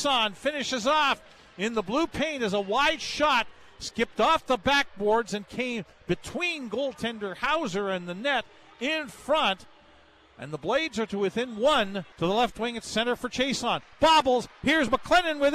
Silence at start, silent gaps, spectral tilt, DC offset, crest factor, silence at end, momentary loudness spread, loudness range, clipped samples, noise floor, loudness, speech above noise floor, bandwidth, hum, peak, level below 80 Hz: 0 s; none; -3.5 dB/octave; under 0.1%; 16 dB; 0 s; 9 LU; 4 LU; under 0.1%; -57 dBFS; -26 LUFS; 30 dB; 14 kHz; none; -10 dBFS; -52 dBFS